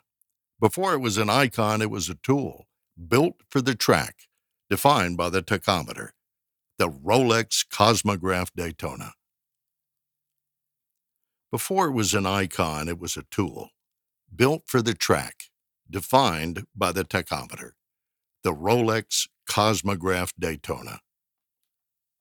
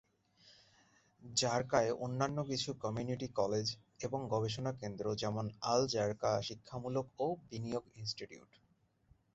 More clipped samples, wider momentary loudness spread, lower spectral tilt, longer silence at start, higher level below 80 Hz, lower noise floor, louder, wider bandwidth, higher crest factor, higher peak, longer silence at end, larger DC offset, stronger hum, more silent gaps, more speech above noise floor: neither; first, 14 LU vs 9 LU; about the same, -4 dB/octave vs -4.5 dB/octave; first, 0.6 s vs 0.45 s; first, -54 dBFS vs -68 dBFS; first, -86 dBFS vs -74 dBFS; first, -24 LUFS vs -38 LUFS; first, over 20 kHz vs 8 kHz; about the same, 22 dB vs 22 dB; first, -4 dBFS vs -16 dBFS; first, 1.25 s vs 0.95 s; neither; neither; neither; first, 62 dB vs 37 dB